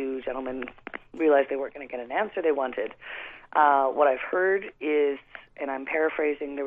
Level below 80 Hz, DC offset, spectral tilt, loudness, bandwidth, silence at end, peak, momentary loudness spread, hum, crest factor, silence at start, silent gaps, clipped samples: -62 dBFS; under 0.1%; -7 dB/octave; -26 LUFS; 3.8 kHz; 0 s; -6 dBFS; 16 LU; none; 20 dB; 0 s; none; under 0.1%